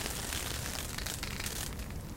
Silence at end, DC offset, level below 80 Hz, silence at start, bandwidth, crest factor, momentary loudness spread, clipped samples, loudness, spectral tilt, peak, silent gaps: 0 s; under 0.1%; -44 dBFS; 0 s; 17 kHz; 24 dB; 3 LU; under 0.1%; -37 LUFS; -2.5 dB/octave; -16 dBFS; none